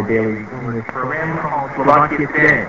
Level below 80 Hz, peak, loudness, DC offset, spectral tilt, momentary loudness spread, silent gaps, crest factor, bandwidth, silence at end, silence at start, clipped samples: -46 dBFS; 0 dBFS; -17 LUFS; 0.3%; -8 dB/octave; 12 LU; none; 16 dB; 8 kHz; 0 s; 0 s; under 0.1%